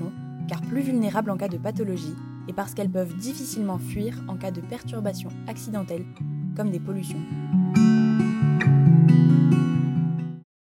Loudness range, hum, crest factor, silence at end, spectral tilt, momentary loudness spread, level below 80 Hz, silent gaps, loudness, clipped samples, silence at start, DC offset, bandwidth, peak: 12 LU; none; 18 dB; 0.25 s; -8 dB/octave; 17 LU; -58 dBFS; none; -23 LUFS; under 0.1%; 0 s; under 0.1%; 16 kHz; -6 dBFS